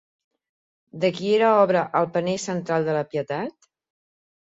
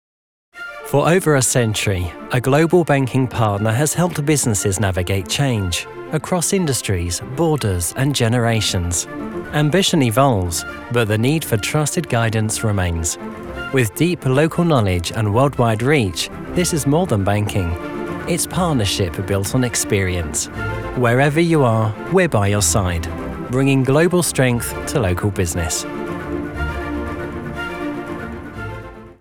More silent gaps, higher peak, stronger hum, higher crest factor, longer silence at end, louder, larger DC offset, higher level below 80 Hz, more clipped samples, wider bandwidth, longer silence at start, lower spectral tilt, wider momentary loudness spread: neither; second, -6 dBFS vs -2 dBFS; neither; about the same, 18 dB vs 16 dB; first, 1 s vs 0.05 s; second, -22 LUFS vs -18 LUFS; neither; second, -68 dBFS vs -40 dBFS; neither; second, 8 kHz vs 19 kHz; first, 0.95 s vs 0.55 s; about the same, -5.5 dB/octave vs -5 dB/octave; about the same, 10 LU vs 11 LU